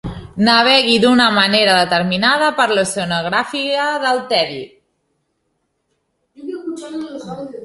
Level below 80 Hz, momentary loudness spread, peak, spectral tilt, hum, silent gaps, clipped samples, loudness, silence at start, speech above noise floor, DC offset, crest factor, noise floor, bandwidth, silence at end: -48 dBFS; 18 LU; 0 dBFS; -3.5 dB/octave; none; none; under 0.1%; -14 LUFS; 0.05 s; 54 dB; under 0.1%; 16 dB; -69 dBFS; 11.5 kHz; 0 s